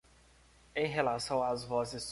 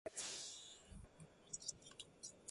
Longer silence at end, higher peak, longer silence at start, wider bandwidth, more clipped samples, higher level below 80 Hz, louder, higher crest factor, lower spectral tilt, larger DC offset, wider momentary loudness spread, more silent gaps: about the same, 0 s vs 0 s; first, -14 dBFS vs -28 dBFS; first, 0.75 s vs 0.05 s; about the same, 11.5 kHz vs 11.5 kHz; neither; first, -62 dBFS vs -70 dBFS; first, -34 LUFS vs -51 LUFS; second, 20 dB vs 26 dB; first, -4 dB/octave vs -1 dB/octave; neither; second, 4 LU vs 15 LU; neither